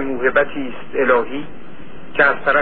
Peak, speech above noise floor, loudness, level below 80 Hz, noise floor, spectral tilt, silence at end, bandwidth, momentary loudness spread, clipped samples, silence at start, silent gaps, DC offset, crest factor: -2 dBFS; 21 dB; -18 LUFS; -46 dBFS; -39 dBFS; -9 dB/octave; 0 s; 4.5 kHz; 13 LU; under 0.1%; 0 s; none; 5%; 18 dB